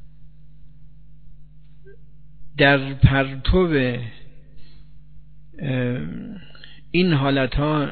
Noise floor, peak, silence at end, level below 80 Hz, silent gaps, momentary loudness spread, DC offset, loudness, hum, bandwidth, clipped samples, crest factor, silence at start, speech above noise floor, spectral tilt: -47 dBFS; 0 dBFS; 0 s; -34 dBFS; none; 19 LU; 1%; -20 LUFS; none; 4.6 kHz; under 0.1%; 22 dB; 0.05 s; 27 dB; -5 dB/octave